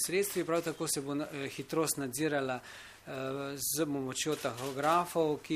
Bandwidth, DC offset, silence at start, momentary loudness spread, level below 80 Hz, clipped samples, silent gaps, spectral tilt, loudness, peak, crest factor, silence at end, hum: 15.5 kHz; under 0.1%; 0 s; 10 LU; -70 dBFS; under 0.1%; none; -3.5 dB/octave; -34 LUFS; -16 dBFS; 18 dB; 0 s; none